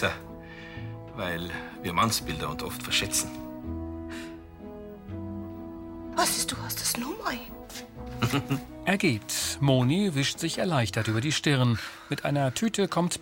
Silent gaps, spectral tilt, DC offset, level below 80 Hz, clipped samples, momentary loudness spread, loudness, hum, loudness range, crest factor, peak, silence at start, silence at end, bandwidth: none; -4 dB/octave; under 0.1%; -50 dBFS; under 0.1%; 16 LU; -28 LUFS; none; 6 LU; 20 dB; -8 dBFS; 0 s; 0 s; 17 kHz